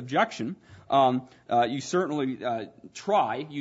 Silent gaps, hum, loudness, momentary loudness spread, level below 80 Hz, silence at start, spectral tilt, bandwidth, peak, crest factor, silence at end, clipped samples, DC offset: none; none; -27 LUFS; 13 LU; -72 dBFS; 0 s; -5 dB/octave; 8 kHz; -10 dBFS; 18 dB; 0 s; under 0.1%; under 0.1%